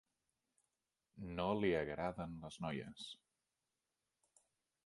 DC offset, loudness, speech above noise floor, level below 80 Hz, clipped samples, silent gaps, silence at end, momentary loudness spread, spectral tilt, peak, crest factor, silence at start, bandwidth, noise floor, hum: under 0.1%; -42 LUFS; over 48 dB; -66 dBFS; under 0.1%; none; 1.7 s; 15 LU; -6 dB/octave; -24 dBFS; 22 dB; 1.15 s; 11.5 kHz; under -90 dBFS; none